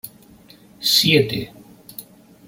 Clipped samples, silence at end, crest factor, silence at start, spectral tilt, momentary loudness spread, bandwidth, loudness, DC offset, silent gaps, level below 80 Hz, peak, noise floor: under 0.1%; 0.45 s; 20 dB; 0.05 s; -3.5 dB/octave; 24 LU; 17 kHz; -17 LUFS; under 0.1%; none; -56 dBFS; -2 dBFS; -48 dBFS